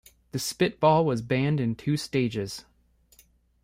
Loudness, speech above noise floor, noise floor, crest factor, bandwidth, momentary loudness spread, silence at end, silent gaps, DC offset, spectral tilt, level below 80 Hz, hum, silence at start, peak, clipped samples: -26 LUFS; 37 dB; -62 dBFS; 18 dB; 16 kHz; 13 LU; 1 s; none; under 0.1%; -6 dB/octave; -58 dBFS; none; 0.35 s; -8 dBFS; under 0.1%